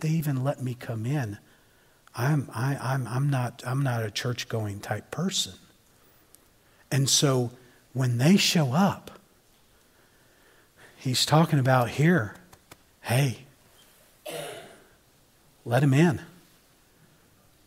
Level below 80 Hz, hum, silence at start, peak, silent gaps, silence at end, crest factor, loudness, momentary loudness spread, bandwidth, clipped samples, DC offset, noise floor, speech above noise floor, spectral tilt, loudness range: -66 dBFS; none; 0 s; -6 dBFS; none; 1.35 s; 22 dB; -26 LUFS; 16 LU; 16 kHz; under 0.1%; under 0.1%; -61 dBFS; 36 dB; -5 dB/octave; 6 LU